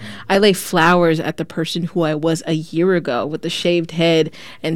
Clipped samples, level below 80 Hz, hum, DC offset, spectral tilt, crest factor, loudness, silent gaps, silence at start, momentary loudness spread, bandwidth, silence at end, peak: under 0.1%; -52 dBFS; none; under 0.1%; -5 dB/octave; 16 dB; -17 LUFS; none; 0 s; 8 LU; 17.5 kHz; 0 s; -2 dBFS